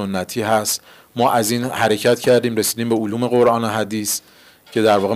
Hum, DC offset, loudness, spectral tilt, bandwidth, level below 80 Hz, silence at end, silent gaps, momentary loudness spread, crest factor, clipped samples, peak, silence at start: none; under 0.1%; -18 LUFS; -4 dB/octave; 16 kHz; -62 dBFS; 0 s; none; 7 LU; 12 dB; under 0.1%; -6 dBFS; 0 s